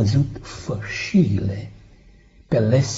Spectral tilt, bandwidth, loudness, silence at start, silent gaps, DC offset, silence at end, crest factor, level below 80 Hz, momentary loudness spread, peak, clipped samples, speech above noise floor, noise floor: -7 dB/octave; 8 kHz; -22 LUFS; 0 s; none; under 0.1%; 0 s; 16 dB; -44 dBFS; 15 LU; -4 dBFS; under 0.1%; 30 dB; -50 dBFS